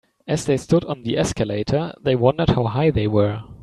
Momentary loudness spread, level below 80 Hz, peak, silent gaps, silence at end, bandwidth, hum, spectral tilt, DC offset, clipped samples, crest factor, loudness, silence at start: 6 LU; -42 dBFS; -2 dBFS; none; 0.05 s; 12.5 kHz; none; -6.5 dB/octave; under 0.1%; under 0.1%; 18 dB; -20 LUFS; 0.25 s